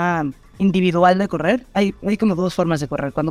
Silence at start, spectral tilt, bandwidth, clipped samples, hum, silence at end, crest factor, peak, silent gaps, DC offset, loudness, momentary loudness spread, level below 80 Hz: 0 s; -7 dB/octave; 12.5 kHz; under 0.1%; none; 0 s; 16 dB; -2 dBFS; none; under 0.1%; -19 LUFS; 7 LU; -46 dBFS